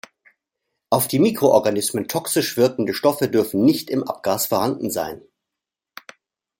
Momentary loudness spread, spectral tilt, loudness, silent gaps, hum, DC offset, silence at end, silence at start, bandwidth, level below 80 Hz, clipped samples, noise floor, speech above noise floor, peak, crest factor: 8 LU; -4.5 dB/octave; -20 LUFS; none; none; under 0.1%; 1.45 s; 0.9 s; 17 kHz; -62 dBFS; under 0.1%; -86 dBFS; 66 dB; -2 dBFS; 18 dB